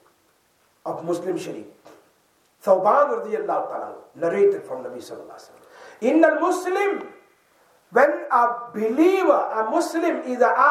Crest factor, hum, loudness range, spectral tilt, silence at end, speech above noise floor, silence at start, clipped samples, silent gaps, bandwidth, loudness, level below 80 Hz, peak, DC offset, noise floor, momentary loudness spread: 18 dB; none; 3 LU; -5 dB/octave; 0 s; 42 dB; 0.85 s; under 0.1%; none; 15 kHz; -21 LUFS; -82 dBFS; -4 dBFS; under 0.1%; -63 dBFS; 18 LU